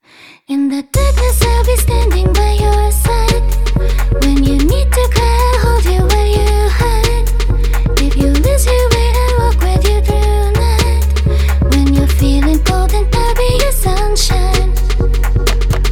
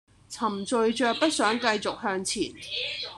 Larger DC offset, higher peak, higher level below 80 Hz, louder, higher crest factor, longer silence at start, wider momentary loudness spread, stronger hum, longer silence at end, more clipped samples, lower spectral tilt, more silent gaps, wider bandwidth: neither; first, 0 dBFS vs -6 dBFS; first, -12 dBFS vs -62 dBFS; first, -13 LUFS vs -27 LUFS; second, 10 dB vs 20 dB; first, 0.5 s vs 0.3 s; second, 4 LU vs 7 LU; neither; about the same, 0 s vs 0 s; neither; first, -5.5 dB/octave vs -2.5 dB/octave; neither; first, 17.5 kHz vs 12.5 kHz